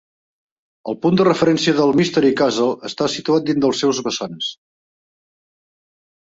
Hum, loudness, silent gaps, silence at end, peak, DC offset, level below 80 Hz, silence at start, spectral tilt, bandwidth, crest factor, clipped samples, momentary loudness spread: none; -18 LUFS; none; 1.8 s; -4 dBFS; under 0.1%; -58 dBFS; 0.85 s; -5 dB/octave; 8 kHz; 16 dB; under 0.1%; 10 LU